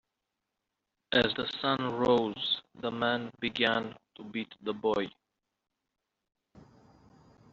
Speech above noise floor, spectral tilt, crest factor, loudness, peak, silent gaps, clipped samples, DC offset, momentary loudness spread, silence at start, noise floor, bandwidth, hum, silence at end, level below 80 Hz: 55 dB; -2 dB/octave; 22 dB; -31 LUFS; -12 dBFS; none; under 0.1%; under 0.1%; 12 LU; 1.1 s; -86 dBFS; 7.6 kHz; none; 0.95 s; -66 dBFS